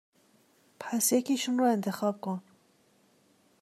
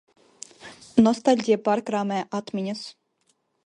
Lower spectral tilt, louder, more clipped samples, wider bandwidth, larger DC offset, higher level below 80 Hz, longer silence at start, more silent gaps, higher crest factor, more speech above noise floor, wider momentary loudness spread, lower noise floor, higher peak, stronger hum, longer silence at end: second, -4 dB/octave vs -5.5 dB/octave; second, -29 LUFS vs -23 LUFS; neither; first, 15 kHz vs 10.5 kHz; neither; second, -86 dBFS vs -64 dBFS; first, 0.8 s vs 0.65 s; neither; about the same, 18 dB vs 20 dB; second, 38 dB vs 47 dB; second, 12 LU vs 23 LU; second, -66 dBFS vs -70 dBFS; second, -14 dBFS vs -4 dBFS; neither; first, 1.2 s vs 0.75 s